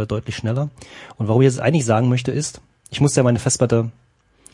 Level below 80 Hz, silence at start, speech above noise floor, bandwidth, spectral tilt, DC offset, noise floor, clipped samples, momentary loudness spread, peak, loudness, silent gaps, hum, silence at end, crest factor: -50 dBFS; 0 s; 33 dB; 11.5 kHz; -5.5 dB/octave; under 0.1%; -52 dBFS; under 0.1%; 13 LU; -2 dBFS; -19 LUFS; none; none; 0.6 s; 18 dB